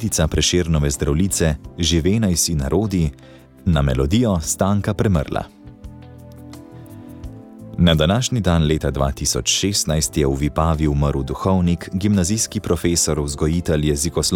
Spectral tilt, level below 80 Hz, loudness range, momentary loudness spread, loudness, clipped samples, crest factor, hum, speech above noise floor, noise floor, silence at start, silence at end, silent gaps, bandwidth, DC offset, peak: -4.5 dB/octave; -30 dBFS; 4 LU; 19 LU; -19 LUFS; under 0.1%; 16 dB; none; 21 dB; -39 dBFS; 0 s; 0 s; none; 18 kHz; under 0.1%; -4 dBFS